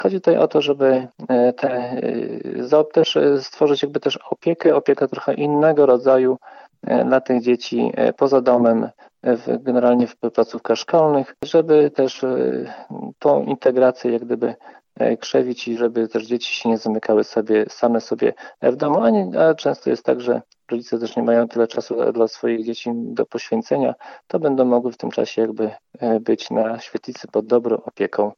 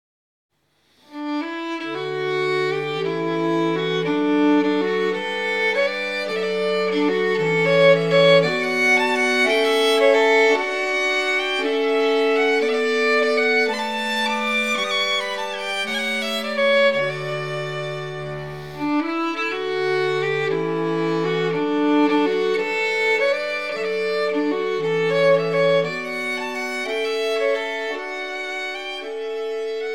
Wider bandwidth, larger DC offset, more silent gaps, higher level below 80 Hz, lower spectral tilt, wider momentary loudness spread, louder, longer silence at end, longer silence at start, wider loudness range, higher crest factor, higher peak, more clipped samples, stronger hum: second, 7 kHz vs 14 kHz; second, under 0.1% vs 0.4%; neither; about the same, -70 dBFS vs -70 dBFS; first, -6 dB/octave vs -4.5 dB/octave; about the same, 9 LU vs 10 LU; about the same, -19 LUFS vs -20 LUFS; about the same, 0.05 s vs 0 s; second, 0 s vs 1.1 s; second, 4 LU vs 7 LU; about the same, 16 dB vs 18 dB; about the same, -2 dBFS vs -4 dBFS; neither; neither